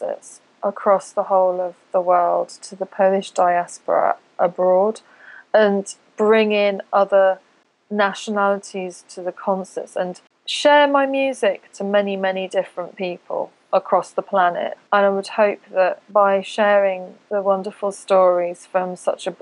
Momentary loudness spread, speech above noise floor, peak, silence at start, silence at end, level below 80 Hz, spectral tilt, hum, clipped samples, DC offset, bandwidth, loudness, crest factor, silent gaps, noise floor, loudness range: 12 LU; 21 dB; -2 dBFS; 0 s; 0.05 s; -88 dBFS; -4.5 dB/octave; none; under 0.1%; under 0.1%; 11 kHz; -19 LUFS; 16 dB; none; -40 dBFS; 3 LU